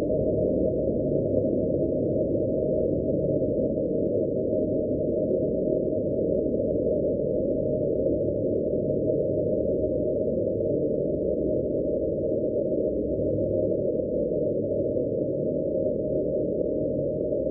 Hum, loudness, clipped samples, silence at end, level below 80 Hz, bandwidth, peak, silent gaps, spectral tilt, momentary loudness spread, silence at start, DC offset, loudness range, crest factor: none; -26 LUFS; under 0.1%; 0 s; -44 dBFS; 0.9 kHz; -12 dBFS; none; -9.5 dB/octave; 2 LU; 0 s; under 0.1%; 1 LU; 14 dB